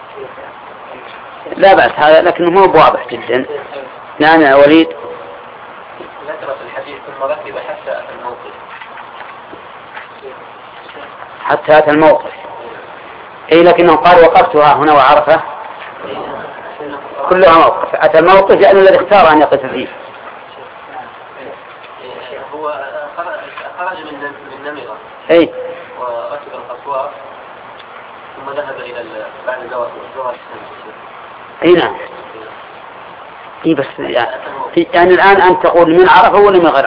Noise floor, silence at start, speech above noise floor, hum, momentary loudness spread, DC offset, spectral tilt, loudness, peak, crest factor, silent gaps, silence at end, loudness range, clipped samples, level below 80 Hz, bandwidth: -32 dBFS; 0 s; 24 dB; none; 25 LU; under 0.1%; -7.5 dB/octave; -9 LUFS; 0 dBFS; 12 dB; none; 0 s; 16 LU; 0.4%; -46 dBFS; 5.4 kHz